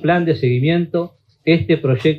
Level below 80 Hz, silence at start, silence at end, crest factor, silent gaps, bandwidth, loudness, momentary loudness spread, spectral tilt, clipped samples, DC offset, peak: -50 dBFS; 0 s; 0 s; 14 dB; none; 6 kHz; -17 LUFS; 8 LU; -9 dB/octave; under 0.1%; under 0.1%; -2 dBFS